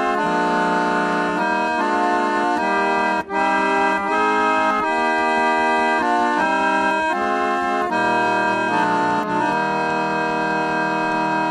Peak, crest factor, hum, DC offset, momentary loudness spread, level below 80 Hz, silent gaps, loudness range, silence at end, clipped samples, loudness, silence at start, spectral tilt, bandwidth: -6 dBFS; 14 dB; none; under 0.1%; 3 LU; -56 dBFS; none; 1 LU; 0 s; under 0.1%; -19 LUFS; 0 s; -4.5 dB/octave; 12 kHz